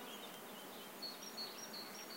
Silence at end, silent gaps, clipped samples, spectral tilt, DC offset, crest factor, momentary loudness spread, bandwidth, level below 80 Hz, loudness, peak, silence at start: 0 s; none; under 0.1%; -1.5 dB/octave; under 0.1%; 14 dB; 5 LU; 16 kHz; under -90 dBFS; -48 LUFS; -36 dBFS; 0 s